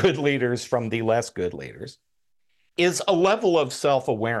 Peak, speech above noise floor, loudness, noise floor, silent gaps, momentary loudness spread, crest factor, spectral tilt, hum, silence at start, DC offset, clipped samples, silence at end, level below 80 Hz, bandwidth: -6 dBFS; 53 dB; -23 LUFS; -76 dBFS; none; 15 LU; 18 dB; -5 dB/octave; none; 0 s; under 0.1%; under 0.1%; 0 s; -58 dBFS; 12.5 kHz